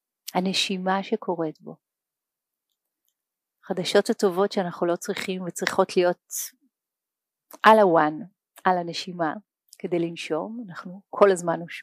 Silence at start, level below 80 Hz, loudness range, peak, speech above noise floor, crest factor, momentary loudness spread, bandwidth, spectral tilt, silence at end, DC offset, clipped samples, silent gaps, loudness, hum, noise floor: 0.25 s; -76 dBFS; 7 LU; -2 dBFS; 64 dB; 22 dB; 16 LU; 15.5 kHz; -4.5 dB/octave; 0 s; under 0.1%; under 0.1%; none; -24 LUFS; none; -88 dBFS